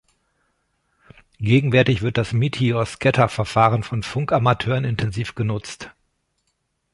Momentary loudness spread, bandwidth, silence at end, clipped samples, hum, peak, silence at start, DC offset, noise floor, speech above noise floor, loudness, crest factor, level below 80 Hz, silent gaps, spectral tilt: 9 LU; 11.5 kHz; 1.05 s; under 0.1%; none; -2 dBFS; 1.4 s; under 0.1%; -72 dBFS; 52 dB; -20 LUFS; 20 dB; -46 dBFS; none; -6.5 dB/octave